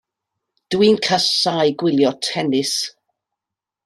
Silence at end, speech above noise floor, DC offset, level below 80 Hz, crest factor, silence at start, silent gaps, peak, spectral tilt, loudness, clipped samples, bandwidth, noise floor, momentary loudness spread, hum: 0.95 s; 69 dB; under 0.1%; -62 dBFS; 16 dB; 0.7 s; none; -2 dBFS; -4 dB/octave; -17 LUFS; under 0.1%; 13 kHz; -86 dBFS; 7 LU; none